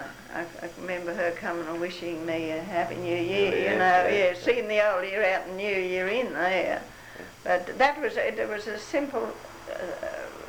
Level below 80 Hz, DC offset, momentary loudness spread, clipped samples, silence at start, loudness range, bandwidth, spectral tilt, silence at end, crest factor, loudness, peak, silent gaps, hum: -58 dBFS; under 0.1%; 13 LU; under 0.1%; 0 s; 5 LU; over 20 kHz; -4.5 dB/octave; 0 s; 18 dB; -27 LUFS; -10 dBFS; none; none